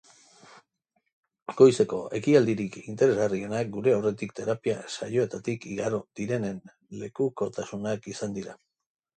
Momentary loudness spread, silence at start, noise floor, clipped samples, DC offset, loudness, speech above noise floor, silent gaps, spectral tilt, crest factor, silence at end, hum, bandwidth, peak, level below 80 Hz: 16 LU; 1.5 s; -77 dBFS; under 0.1%; under 0.1%; -27 LUFS; 50 dB; none; -6 dB/octave; 22 dB; 0.65 s; none; 9.2 kHz; -4 dBFS; -66 dBFS